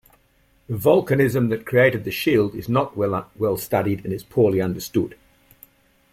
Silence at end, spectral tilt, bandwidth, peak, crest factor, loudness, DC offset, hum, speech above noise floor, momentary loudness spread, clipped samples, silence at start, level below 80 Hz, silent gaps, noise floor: 1 s; -6.5 dB/octave; 16.5 kHz; -4 dBFS; 18 dB; -21 LUFS; under 0.1%; none; 40 dB; 7 LU; under 0.1%; 0.7 s; -54 dBFS; none; -60 dBFS